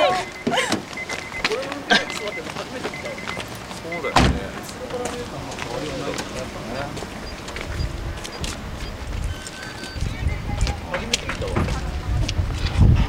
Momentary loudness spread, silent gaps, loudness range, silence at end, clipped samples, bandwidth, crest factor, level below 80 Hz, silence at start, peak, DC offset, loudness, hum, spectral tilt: 12 LU; none; 7 LU; 0 s; under 0.1%; 16.5 kHz; 22 dB; -30 dBFS; 0 s; -2 dBFS; under 0.1%; -25 LUFS; none; -4.5 dB/octave